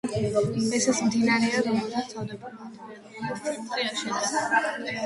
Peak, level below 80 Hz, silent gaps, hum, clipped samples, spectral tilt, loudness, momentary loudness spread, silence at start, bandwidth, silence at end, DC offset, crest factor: -10 dBFS; -60 dBFS; none; none; under 0.1%; -4 dB/octave; -26 LUFS; 18 LU; 0.05 s; 11.5 kHz; 0 s; under 0.1%; 16 dB